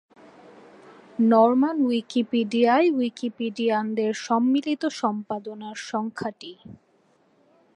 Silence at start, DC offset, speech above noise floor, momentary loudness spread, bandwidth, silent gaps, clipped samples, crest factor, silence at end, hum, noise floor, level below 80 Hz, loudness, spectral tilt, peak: 0.85 s; under 0.1%; 40 dB; 14 LU; 9.8 kHz; none; under 0.1%; 18 dB; 1.05 s; none; -63 dBFS; -74 dBFS; -23 LUFS; -5.5 dB/octave; -8 dBFS